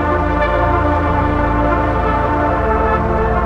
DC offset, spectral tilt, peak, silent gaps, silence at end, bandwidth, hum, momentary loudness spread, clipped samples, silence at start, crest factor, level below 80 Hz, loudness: under 0.1%; -8.5 dB/octave; -2 dBFS; none; 0 s; 6.6 kHz; none; 1 LU; under 0.1%; 0 s; 12 dB; -22 dBFS; -15 LUFS